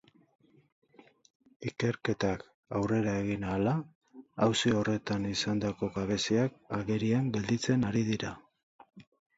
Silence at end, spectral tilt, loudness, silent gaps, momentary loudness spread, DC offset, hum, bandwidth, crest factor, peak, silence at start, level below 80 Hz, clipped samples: 0.35 s; -5.5 dB/octave; -31 LUFS; 2.54-2.63 s, 3.95-4.01 s, 8.63-8.79 s; 9 LU; under 0.1%; none; 8 kHz; 18 dB; -14 dBFS; 1.6 s; -58 dBFS; under 0.1%